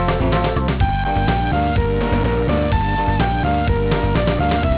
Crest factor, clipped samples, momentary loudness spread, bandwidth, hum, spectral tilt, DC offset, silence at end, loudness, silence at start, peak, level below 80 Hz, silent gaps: 12 dB; under 0.1%; 1 LU; 4 kHz; none; -11 dB/octave; 0.4%; 0 s; -18 LUFS; 0 s; -6 dBFS; -22 dBFS; none